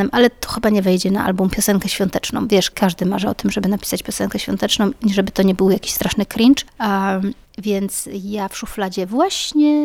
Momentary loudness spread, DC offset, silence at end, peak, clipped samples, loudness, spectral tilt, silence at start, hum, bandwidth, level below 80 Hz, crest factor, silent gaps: 8 LU; under 0.1%; 0 s; -2 dBFS; under 0.1%; -18 LUFS; -4.5 dB/octave; 0 s; none; 17.5 kHz; -42 dBFS; 16 dB; none